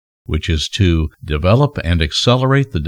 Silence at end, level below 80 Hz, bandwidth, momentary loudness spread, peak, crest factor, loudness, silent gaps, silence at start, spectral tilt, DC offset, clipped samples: 0 s; -26 dBFS; 10.5 kHz; 7 LU; 0 dBFS; 16 dB; -16 LUFS; none; 0.3 s; -6 dB/octave; under 0.1%; under 0.1%